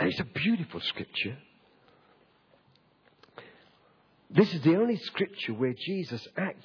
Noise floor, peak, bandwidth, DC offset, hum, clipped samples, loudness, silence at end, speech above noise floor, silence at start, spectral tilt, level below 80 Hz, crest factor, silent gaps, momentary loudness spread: -65 dBFS; -8 dBFS; 5.4 kHz; under 0.1%; none; under 0.1%; -29 LUFS; 0.1 s; 36 dB; 0 s; -7.5 dB/octave; -68 dBFS; 24 dB; none; 13 LU